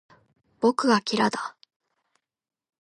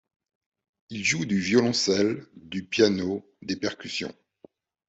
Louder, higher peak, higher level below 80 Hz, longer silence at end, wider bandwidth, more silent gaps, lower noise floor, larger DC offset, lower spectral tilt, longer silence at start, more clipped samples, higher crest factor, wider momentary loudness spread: about the same, -24 LUFS vs -26 LUFS; about the same, -8 dBFS vs -6 dBFS; second, -76 dBFS vs -66 dBFS; first, 1.3 s vs 0.75 s; first, 11 kHz vs 8.2 kHz; neither; first, -75 dBFS vs -57 dBFS; neither; about the same, -4.5 dB/octave vs -4 dB/octave; second, 0.6 s vs 0.9 s; neither; about the same, 20 dB vs 22 dB; about the same, 12 LU vs 14 LU